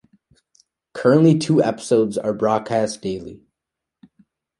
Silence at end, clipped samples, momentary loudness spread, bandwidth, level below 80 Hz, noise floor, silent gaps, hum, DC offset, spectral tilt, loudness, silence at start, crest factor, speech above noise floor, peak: 1.25 s; under 0.1%; 15 LU; 11.5 kHz; -58 dBFS; -84 dBFS; none; none; under 0.1%; -6.5 dB/octave; -19 LUFS; 0.95 s; 18 dB; 66 dB; -2 dBFS